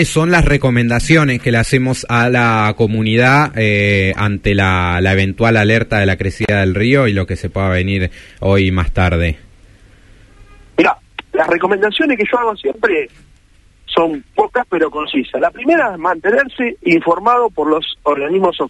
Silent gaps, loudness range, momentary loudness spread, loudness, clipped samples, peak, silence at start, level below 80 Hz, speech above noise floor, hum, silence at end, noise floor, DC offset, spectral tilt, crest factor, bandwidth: none; 5 LU; 6 LU; -14 LUFS; under 0.1%; 0 dBFS; 0 s; -30 dBFS; 34 dB; none; 0 s; -48 dBFS; under 0.1%; -6 dB/octave; 14 dB; 11.5 kHz